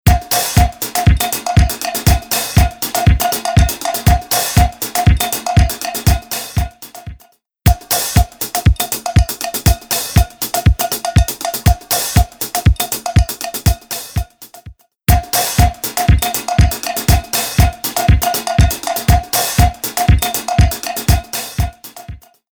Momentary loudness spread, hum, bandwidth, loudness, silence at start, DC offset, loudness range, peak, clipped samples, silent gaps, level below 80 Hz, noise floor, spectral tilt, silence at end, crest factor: 7 LU; none; over 20 kHz; -15 LUFS; 0.05 s; under 0.1%; 3 LU; 0 dBFS; under 0.1%; none; -18 dBFS; -50 dBFS; -4.5 dB/octave; 0.35 s; 14 dB